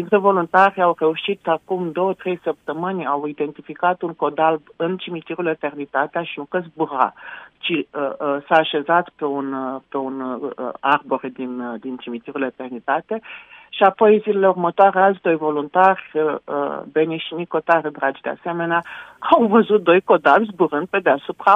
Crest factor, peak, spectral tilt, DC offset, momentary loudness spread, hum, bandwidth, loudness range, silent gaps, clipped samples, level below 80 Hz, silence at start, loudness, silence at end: 18 dB; 0 dBFS; -7.5 dB/octave; under 0.1%; 13 LU; none; 6 kHz; 7 LU; none; under 0.1%; -68 dBFS; 0 s; -20 LUFS; 0 s